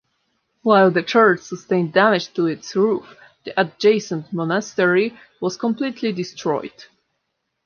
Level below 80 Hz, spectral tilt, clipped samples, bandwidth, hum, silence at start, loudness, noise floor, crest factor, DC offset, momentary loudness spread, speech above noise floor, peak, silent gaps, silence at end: -70 dBFS; -5.5 dB/octave; under 0.1%; 7 kHz; none; 0.65 s; -19 LUFS; -75 dBFS; 18 dB; under 0.1%; 11 LU; 56 dB; -2 dBFS; none; 0.85 s